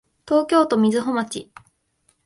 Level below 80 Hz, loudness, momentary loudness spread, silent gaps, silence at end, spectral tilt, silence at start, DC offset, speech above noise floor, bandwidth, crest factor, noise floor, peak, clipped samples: -64 dBFS; -20 LUFS; 12 LU; none; 0.8 s; -5.5 dB/octave; 0.25 s; under 0.1%; 46 dB; 11.5 kHz; 18 dB; -66 dBFS; -4 dBFS; under 0.1%